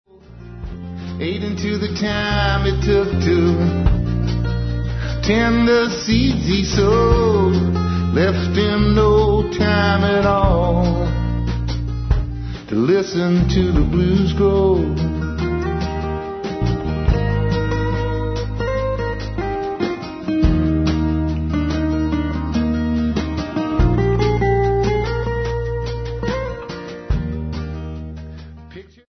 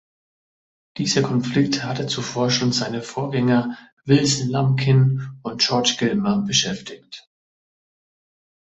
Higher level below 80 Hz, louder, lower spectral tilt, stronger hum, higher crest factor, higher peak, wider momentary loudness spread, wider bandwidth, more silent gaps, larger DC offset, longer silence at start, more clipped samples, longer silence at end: first, -26 dBFS vs -56 dBFS; about the same, -19 LUFS vs -20 LUFS; first, -7 dB/octave vs -4.5 dB/octave; neither; about the same, 16 dB vs 18 dB; about the same, -2 dBFS vs -4 dBFS; second, 10 LU vs 14 LU; second, 6.4 kHz vs 8.2 kHz; second, none vs 3.92-3.97 s; neither; second, 0.3 s vs 0.95 s; neither; second, 0.25 s vs 1.45 s